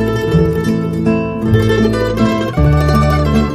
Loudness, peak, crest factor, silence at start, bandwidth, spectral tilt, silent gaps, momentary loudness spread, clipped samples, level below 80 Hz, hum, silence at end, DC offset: -13 LUFS; 0 dBFS; 12 dB; 0 s; 15.5 kHz; -7.5 dB/octave; none; 4 LU; under 0.1%; -22 dBFS; none; 0 s; under 0.1%